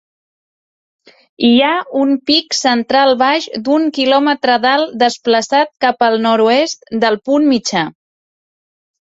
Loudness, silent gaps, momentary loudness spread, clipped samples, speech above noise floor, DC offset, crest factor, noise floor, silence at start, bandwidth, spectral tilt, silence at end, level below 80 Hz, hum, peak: -13 LUFS; none; 5 LU; under 0.1%; over 77 dB; under 0.1%; 14 dB; under -90 dBFS; 1.4 s; 8 kHz; -3 dB/octave; 1.3 s; -60 dBFS; none; 0 dBFS